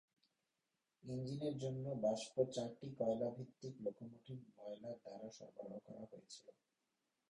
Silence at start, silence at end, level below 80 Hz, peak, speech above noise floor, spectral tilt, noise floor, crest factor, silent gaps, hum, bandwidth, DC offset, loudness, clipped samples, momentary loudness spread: 1.05 s; 0.8 s; -80 dBFS; -24 dBFS; 44 dB; -6.5 dB/octave; -90 dBFS; 22 dB; none; none; 11 kHz; under 0.1%; -46 LUFS; under 0.1%; 16 LU